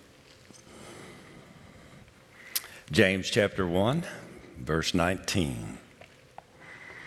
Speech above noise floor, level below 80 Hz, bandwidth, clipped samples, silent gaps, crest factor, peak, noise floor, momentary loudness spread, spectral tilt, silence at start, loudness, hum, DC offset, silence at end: 28 dB; -56 dBFS; 16.5 kHz; under 0.1%; none; 26 dB; -6 dBFS; -55 dBFS; 26 LU; -4.5 dB/octave; 0.55 s; -28 LUFS; none; under 0.1%; 0 s